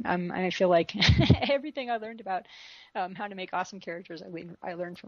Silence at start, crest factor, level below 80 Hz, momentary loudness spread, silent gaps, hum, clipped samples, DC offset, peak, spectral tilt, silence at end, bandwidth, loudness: 0 s; 22 dB; -44 dBFS; 18 LU; none; none; under 0.1%; under 0.1%; -6 dBFS; -6 dB/octave; 0.05 s; 7.2 kHz; -28 LUFS